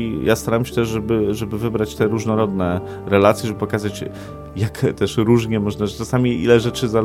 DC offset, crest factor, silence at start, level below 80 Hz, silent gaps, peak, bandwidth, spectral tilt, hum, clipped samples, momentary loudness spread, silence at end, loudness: under 0.1%; 18 dB; 0 s; -42 dBFS; none; 0 dBFS; 16.5 kHz; -6.5 dB/octave; none; under 0.1%; 10 LU; 0 s; -19 LUFS